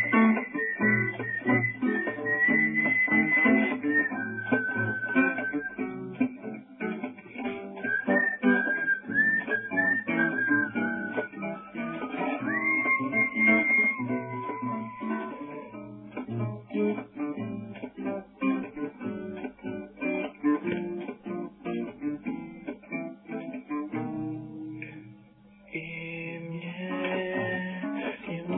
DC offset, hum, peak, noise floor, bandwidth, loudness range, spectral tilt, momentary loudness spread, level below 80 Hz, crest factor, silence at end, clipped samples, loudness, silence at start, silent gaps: under 0.1%; none; -10 dBFS; -55 dBFS; 3.8 kHz; 12 LU; -10 dB/octave; 15 LU; -68 dBFS; 20 dB; 0 s; under 0.1%; -28 LUFS; 0 s; none